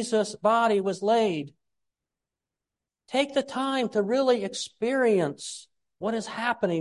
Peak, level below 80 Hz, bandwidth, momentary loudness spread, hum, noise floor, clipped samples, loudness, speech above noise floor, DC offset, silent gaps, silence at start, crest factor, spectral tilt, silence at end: -10 dBFS; -74 dBFS; 11.5 kHz; 11 LU; none; -89 dBFS; under 0.1%; -26 LUFS; 63 dB; under 0.1%; none; 0 s; 18 dB; -4.5 dB/octave; 0 s